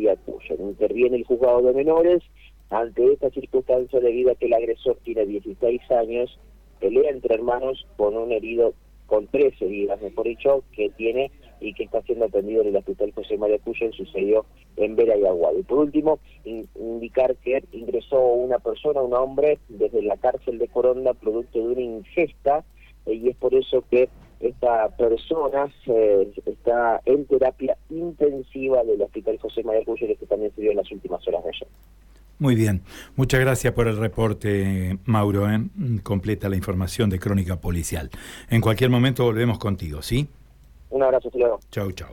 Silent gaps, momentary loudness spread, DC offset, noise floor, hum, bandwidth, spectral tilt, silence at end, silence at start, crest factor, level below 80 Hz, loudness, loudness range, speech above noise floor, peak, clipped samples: none; 9 LU; under 0.1%; -49 dBFS; none; 18 kHz; -7 dB/octave; 0 s; 0 s; 14 dB; -44 dBFS; -23 LUFS; 3 LU; 27 dB; -8 dBFS; under 0.1%